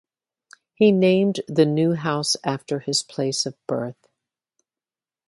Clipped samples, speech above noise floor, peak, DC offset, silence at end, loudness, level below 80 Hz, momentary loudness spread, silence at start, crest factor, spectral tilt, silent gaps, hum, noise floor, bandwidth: under 0.1%; over 69 dB; -4 dBFS; under 0.1%; 1.35 s; -21 LUFS; -68 dBFS; 10 LU; 0.8 s; 18 dB; -5 dB/octave; none; none; under -90 dBFS; 11.5 kHz